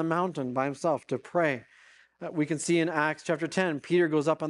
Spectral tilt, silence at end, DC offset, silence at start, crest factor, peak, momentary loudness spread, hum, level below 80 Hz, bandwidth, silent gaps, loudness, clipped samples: -5.5 dB/octave; 0 s; under 0.1%; 0 s; 18 dB; -10 dBFS; 7 LU; none; -76 dBFS; 11.5 kHz; none; -28 LUFS; under 0.1%